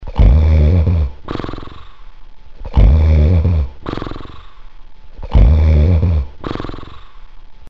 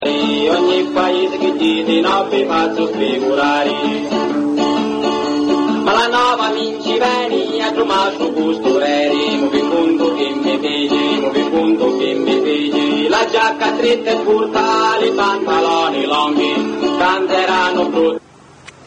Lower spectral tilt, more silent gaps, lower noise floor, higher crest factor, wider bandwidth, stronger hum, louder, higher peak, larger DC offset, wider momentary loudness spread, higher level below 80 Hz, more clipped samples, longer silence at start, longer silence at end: first, -9.5 dB/octave vs -4 dB/octave; neither; second, -34 dBFS vs -42 dBFS; about the same, 12 dB vs 14 dB; second, 5.4 kHz vs 9.2 kHz; neither; about the same, -14 LUFS vs -15 LUFS; about the same, -2 dBFS vs -2 dBFS; first, 2% vs under 0.1%; first, 18 LU vs 4 LU; first, -16 dBFS vs -54 dBFS; neither; about the same, 0 s vs 0 s; about the same, 0 s vs 0 s